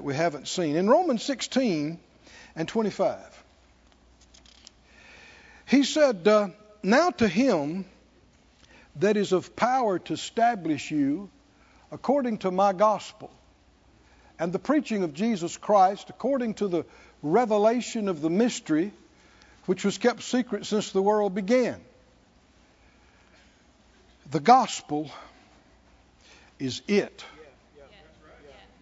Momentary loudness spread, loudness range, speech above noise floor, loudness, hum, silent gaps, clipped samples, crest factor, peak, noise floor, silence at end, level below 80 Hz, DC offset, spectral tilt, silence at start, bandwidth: 14 LU; 7 LU; 35 dB; -25 LUFS; none; none; under 0.1%; 22 dB; -4 dBFS; -59 dBFS; 1 s; -64 dBFS; under 0.1%; -5 dB/octave; 0 s; 8 kHz